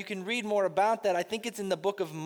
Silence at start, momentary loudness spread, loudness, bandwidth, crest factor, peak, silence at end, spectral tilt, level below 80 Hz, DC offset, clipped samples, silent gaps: 0 s; 7 LU; -30 LUFS; over 20 kHz; 16 dB; -14 dBFS; 0 s; -4 dB/octave; -78 dBFS; under 0.1%; under 0.1%; none